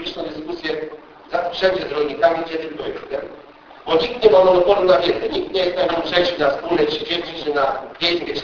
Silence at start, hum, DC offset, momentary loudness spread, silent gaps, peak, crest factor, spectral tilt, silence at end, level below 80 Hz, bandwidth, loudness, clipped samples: 0 s; none; under 0.1%; 14 LU; none; 0 dBFS; 20 dB; -5 dB/octave; 0 s; -48 dBFS; 5.4 kHz; -19 LUFS; under 0.1%